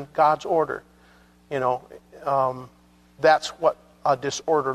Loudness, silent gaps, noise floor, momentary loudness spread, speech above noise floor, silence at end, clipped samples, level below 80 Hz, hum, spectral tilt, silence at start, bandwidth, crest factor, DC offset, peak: -24 LUFS; none; -55 dBFS; 12 LU; 32 dB; 0 s; under 0.1%; -62 dBFS; 60 Hz at -60 dBFS; -4 dB/octave; 0 s; 13.5 kHz; 18 dB; under 0.1%; -6 dBFS